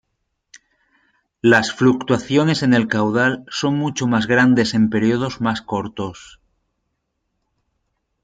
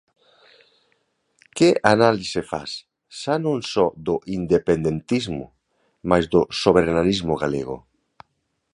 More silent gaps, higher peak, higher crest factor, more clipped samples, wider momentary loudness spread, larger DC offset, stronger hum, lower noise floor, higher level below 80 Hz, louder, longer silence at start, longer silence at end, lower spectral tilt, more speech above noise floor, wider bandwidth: neither; about the same, 0 dBFS vs 0 dBFS; about the same, 18 dB vs 22 dB; neither; second, 9 LU vs 16 LU; neither; neither; about the same, -74 dBFS vs -73 dBFS; second, -56 dBFS vs -48 dBFS; first, -18 LUFS vs -21 LUFS; about the same, 1.45 s vs 1.55 s; first, 2 s vs 0.95 s; about the same, -5.5 dB/octave vs -5.5 dB/octave; about the same, 56 dB vs 53 dB; second, 9.2 kHz vs 11 kHz